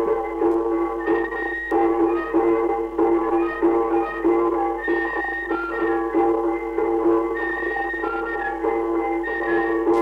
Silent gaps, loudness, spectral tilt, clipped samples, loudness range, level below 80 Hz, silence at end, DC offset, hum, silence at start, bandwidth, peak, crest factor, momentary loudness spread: none; -22 LUFS; -7 dB/octave; under 0.1%; 2 LU; -46 dBFS; 0 s; under 0.1%; none; 0 s; 4.9 kHz; -8 dBFS; 12 dB; 5 LU